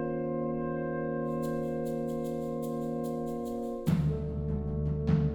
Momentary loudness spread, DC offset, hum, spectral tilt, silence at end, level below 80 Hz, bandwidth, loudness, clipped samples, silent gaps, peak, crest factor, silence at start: 5 LU; under 0.1%; none; -9 dB/octave; 0 s; -44 dBFS; 18.5 kHz; -33 LUFS; under 0.1%; none; -14 dBFS; 16 dB; 0 s